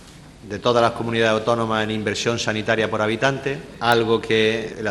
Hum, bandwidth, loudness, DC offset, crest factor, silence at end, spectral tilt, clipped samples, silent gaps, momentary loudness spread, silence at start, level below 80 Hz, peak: none; 12.5 kHz; -20 LUFS; under 0.1%; 20 dB; 0 s; -4.5 dB/octave; under 0.1%; none; 6 LU; 0 s; -50 dBFS; 0 dBFS